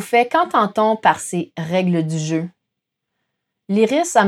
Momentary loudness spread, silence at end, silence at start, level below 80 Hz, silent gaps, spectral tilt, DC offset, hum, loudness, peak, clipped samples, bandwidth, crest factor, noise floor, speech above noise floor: 9 LU; 0 s; 0 s; -72 dBFS; none; -5 dB/octave; under 0.1%; none; -18 LUFS; -2 dBFS; under 0.1%; 14.5 kHz; 16 dB; -79 dBFS; 61 dB